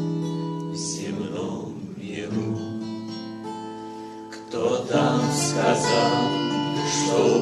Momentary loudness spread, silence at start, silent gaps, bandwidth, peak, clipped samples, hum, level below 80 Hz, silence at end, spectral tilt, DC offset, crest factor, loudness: 15 LU; 0 s; none; 13 kHz; -6 dBFS; under 0.1%; none; -64 dBFS; 0 s; -4.5 dB/octave; under 0.1%; 18 dB; -25 LUFS